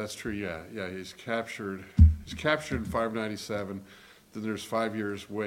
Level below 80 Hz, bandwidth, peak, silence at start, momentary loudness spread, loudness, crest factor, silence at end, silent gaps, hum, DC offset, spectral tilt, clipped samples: -34 dBFS; 14 kHz; -6 dBFS; 0 s; 16 LU; -30 LUFS; 24 dB; 0 s; none; none; under 0.1%; -6.5 dB/octave; under 0.1%